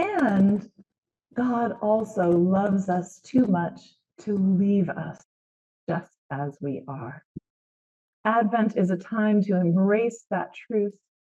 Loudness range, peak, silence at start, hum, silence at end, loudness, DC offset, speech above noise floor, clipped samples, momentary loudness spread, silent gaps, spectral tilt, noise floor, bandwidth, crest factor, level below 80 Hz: 6 LU; -10 dBFS; 0 s; none; 0.3 s; -25 LUFS; under 0.1%; over 66 dB; under 0.1%; 13 LU; 0.98-1.02 s, 5.25-5.87 s, 6.18-6.29 s, 7.25-7.35 s, 7.50-8.24 s; -8.5 dB/octave; under -90 dBFS; 8 kHz; 16 dB; -66 dBFS